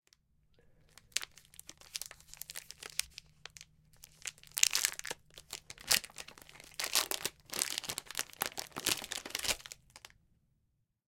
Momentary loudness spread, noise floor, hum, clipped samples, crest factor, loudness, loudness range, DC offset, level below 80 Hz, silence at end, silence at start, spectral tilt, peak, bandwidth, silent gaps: 21 LU; -79 dBFS; none; under 0.1%; 40 dB; -35 LUFS; 10 LU; under 0.1%; -68 dBFS; 1 s; 1.15 s; 1 dB/octave; 0 dBFS; 17 kHz; none